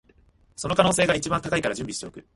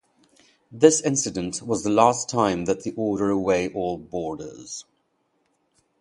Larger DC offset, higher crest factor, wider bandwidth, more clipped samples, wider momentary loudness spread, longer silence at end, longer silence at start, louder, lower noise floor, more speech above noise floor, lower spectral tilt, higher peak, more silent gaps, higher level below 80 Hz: neither; about the same, 22 dB vs 24 dB; about the same, 11.5 kHz vs 11.5 kHz; neither; about the same, 14 LU vs 16 LU; second, 0.15 s vs 1.2 s; about the same, 0.6 s vs 0.7 s; about the same, -24 LUFS vs -23 LUFS; second, -59 dBFS vs -70 dBFS; second, 34 dB vs 48 dB; about the same, -4 dB/octave vs -4.5 dB/octave; second, -4 dBFS vs 0 dBFS; neither; first, -50 dBFS vs -56 dBFS